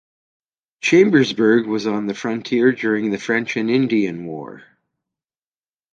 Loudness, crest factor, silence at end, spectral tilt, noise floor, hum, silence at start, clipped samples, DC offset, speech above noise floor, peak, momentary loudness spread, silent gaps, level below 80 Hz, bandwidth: -18 LUFS; 18 dB; 1.35 s; -5.5 dB/octave; under -90 dBFS; none; 0.85 s; under 0.1%; under 0.1%; over 72 dB; 0 dBFS; 11 LU; none; -64 dBFS; 8.6 kHz